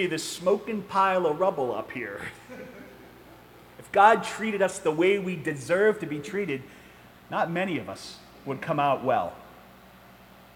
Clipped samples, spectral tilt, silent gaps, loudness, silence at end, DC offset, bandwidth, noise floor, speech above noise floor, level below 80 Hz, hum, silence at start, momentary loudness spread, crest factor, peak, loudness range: under 0.1%; -5 dB/octave; none; -26 LUFS; 0.95 s; under 0.1%; 17.5 kHz; -51 dBFS; 26 dB; -64 dBFS; 60 Hz at -60 dBFS; 0 s; 18 LU; 22 dB; -6 dBFS; 5 LU